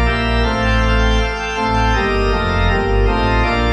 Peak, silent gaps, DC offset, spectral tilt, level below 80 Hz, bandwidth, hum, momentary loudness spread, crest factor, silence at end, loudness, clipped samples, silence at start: -2 dBFS; none; under 0.1%; -6 dB/octave; -18 dBFS; 8.8 kHz; none; 2 LU; 12 dB; 0 s; -16 LUFS; under 0.1%; 0 s